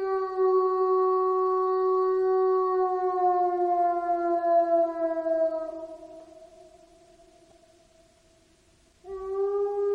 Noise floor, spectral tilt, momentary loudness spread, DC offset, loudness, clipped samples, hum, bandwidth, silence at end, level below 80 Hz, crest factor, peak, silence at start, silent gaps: -62 dBFS; -6.5 dB/octave; 11 LU; under 0.1%; -25 LUFS; under 0.1%; none; 5 kHz; 0 s; -66 dBFS; 12 dB; -14 dBFS; 0 s; none